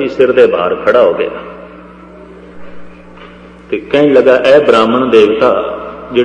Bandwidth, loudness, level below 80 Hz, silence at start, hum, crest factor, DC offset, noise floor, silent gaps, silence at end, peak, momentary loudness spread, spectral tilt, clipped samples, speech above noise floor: 9.6 kHz; -9 LUFS; -44 dBFS; 0 s; 60 Hz at -40 dBFS; 10 dB; under 0.1%; -34 dBFS; none; 0 s; 0 dBFS; 14 LU; -6 dB/octave; 0.5%; 25 dB